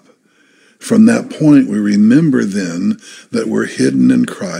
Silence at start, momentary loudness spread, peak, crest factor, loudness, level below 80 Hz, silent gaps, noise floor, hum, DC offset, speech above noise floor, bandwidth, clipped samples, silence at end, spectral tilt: 0.8 s; 10 LU; 0 dBFS; 12 dB; -12 LUFS; -62 dBFS; none; -52 dBFS; none; under 0.1%; 41 dB; 11.5 kHz; under 0.1%; 0 s; -6.5 dB/octave